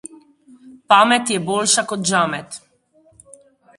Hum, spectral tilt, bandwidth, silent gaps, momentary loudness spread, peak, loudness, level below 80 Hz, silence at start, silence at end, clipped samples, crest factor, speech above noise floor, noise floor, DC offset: none; -2.5 dB/octave; 11.5 kHz; none; 17 LU; 0 dBFS; -16 LUFS; -62 dBFS; 0.65 s; 1.2 s; under 0.1%; 20 dB; 39 dB; -56 dBFS; under 0.1%